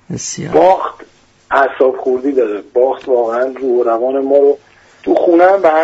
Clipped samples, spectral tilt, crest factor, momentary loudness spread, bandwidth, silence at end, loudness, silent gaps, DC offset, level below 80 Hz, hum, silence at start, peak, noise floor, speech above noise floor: under 0.1%; -5 dB/octave; 12 dB; 8 LU; 8 kHz; 0 s; -13 LUFS; none; under 0.1%; -54 dBFS; none; 0.1 s; 0 dBFS; -42 dBFS; 30 dB